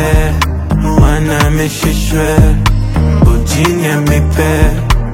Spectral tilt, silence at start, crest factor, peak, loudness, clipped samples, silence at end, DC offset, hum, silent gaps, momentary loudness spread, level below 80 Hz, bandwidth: -6 dB/octave; 0 s; 10 dB; 0 dBFS; -11 LUFS; 0.2%; 0 s; under 0.1%; none; none; 4 LU; -14 dBFS; 16.5 kHz